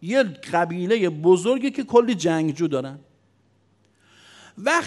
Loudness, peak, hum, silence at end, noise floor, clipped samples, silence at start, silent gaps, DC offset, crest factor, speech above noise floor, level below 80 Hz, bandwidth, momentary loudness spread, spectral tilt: -21 LUFS; -4 dBFS; none; 0 s; -62 dBFS; under 0.1%; 0 s; none; under 0.1%; 20 dB; 41 dB; -72 dBFS; 12 kHz; 7 LU; -5.5 dB/octave